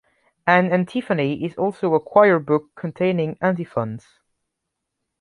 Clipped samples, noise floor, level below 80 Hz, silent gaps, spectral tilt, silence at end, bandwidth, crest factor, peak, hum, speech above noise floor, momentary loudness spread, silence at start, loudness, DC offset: under 0.1%; -80 dBFS; -64 dBFS; none; -8 dB/octave; 1.2 s; 10.5 kHz; 20 dB; -2 dBFS; none; 60 dB; 11 LU; 0.45 s; -20 LUFS; under 0.1%